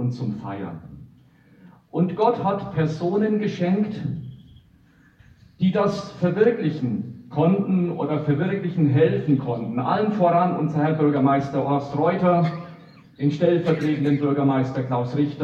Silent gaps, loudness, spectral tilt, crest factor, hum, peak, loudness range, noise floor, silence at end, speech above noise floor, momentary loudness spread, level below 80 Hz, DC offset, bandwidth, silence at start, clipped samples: none; -22 LUFS; -9 dB/octave; 16 dB; none; -6 dBFS; 4 LU; -55 dBFS; 0 s; 34 dB; 11 LU; -58 dBFS; under 0.1%; 7.4 kHz; 0 s; under 0.1%